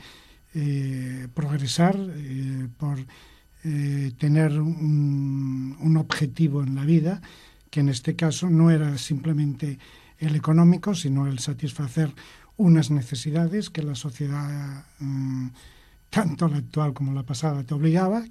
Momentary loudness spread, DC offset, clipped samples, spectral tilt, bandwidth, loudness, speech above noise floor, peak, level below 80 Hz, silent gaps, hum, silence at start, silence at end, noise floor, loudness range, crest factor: 12 LU; under 0.1%; under 0.1%; -7 dB/octave; 12.5 kHz; -24 LUFS; 26 dB; -4 dBFS; -56 dBFS; none; none; 0 s; 0 s; -50 dBFS; 6 LU; 20 dB